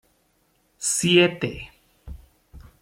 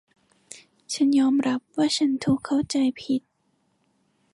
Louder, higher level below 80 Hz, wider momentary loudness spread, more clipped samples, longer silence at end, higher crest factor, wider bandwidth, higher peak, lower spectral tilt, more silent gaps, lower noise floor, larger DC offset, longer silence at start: first, -21 LUFS vs -24 LUFS; first, -48 dBFS vs -62 dBFS; first, 27 LU vs 24 LU; neither; second, 0.25 s vs 1.15 s; first, 22 dB vs 14 dB; first, 16 kHz vs 11.5 kHz; first, -4 dBFS vs -12 dBFS; about the same, -3.5 dB/octave vs -4.5 dB/octave; neither; second, -66 dBFS vs -70 dBFS; neither; first, 0.8 s vs 0.55 s